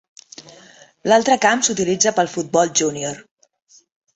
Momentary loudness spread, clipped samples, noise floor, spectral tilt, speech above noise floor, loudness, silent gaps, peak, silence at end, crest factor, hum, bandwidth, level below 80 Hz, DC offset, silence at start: 17 LU; under 0.1%; -47 dBFS; -2.5 dB/octave; 30 dB; -17 LUFS; none; -2 dBFS; 0.95 s; 18 dB; none; 8.4 kHz; -62 dBFS; under 0.1%; 0.4 s